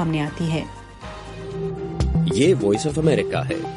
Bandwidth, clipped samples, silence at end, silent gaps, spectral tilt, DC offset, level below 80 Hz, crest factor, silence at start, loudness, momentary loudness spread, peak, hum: 11.5 kHz; under 0.1%; 0 s; none; -6.5 dB/octave; under 0.1%; -36 dBFS; 16 dB; 0 s; -21 LUFS; 18 LU; -6 dBFS; none